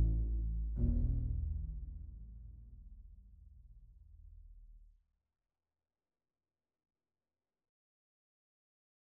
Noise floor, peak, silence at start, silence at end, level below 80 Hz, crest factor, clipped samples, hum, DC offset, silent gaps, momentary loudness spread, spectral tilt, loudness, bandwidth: under -90 dBFS; -22 dBFS; 0 s; 4.25 s; -42 dBFS; 18 dB; under 0.1%; none; under 0.1%; none; 26 LU; -15.5 dB/octave; -39 LUFS; 0.9 kHz